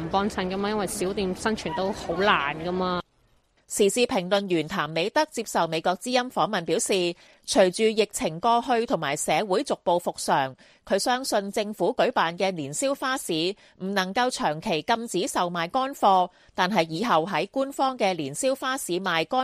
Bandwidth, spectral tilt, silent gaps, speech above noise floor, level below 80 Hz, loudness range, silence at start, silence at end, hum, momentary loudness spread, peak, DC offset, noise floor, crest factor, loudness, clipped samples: 15 kHz; -3.5 dB/octave; none; 39 dB; -56 dBFS; 2 LU; 0 s; 0 s; none; 6 LU; -4 dBFS; under 0.1%; -64 dBFS; 20 dB; -25 LUFS; under 0.1%